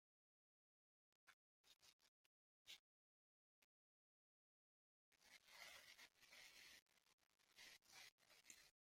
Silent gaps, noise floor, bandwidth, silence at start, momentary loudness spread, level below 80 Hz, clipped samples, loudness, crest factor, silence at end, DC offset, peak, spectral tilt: 1.33-1.64 s, 1.93-1.99 s, 2.08-2.66 s, 2.79-5.12 s, 6.82-6.86 s, 7.13-7.18 s, 8.12-8.18 s; under -90 dBFS; 16 kHz; 1.25 s; 5 LU; under -90 dBFS; under 0.1%; -65 LUFS; 26 dB; 0.2 s; under 0.1%; -46 dBFS; 1 dB/octave